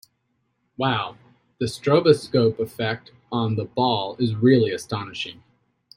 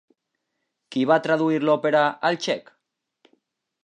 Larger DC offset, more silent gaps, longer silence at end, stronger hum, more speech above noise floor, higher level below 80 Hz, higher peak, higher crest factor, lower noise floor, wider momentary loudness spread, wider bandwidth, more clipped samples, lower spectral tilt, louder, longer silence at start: neither; neither; second, 0.65 s vs 1.25 s; neither; second, 50 dB vs 58 dB; first, -62 dBFS vs -80 dBFS; about the same, -2 dBFS vs -4 dBFS; about the same, 20 dB vs 20 dB; second, -72 dBFS vs -79 dBFS; first, 13 LU vs 8 LU; first, 16 kHz vs 9.6 kHz; neither; about the same, -6.5 dB/octave vs -5.5 dB/octave; about the same, -22 LUFS vs -22 LUFS; about the same, 0.8 s vs 0.9 s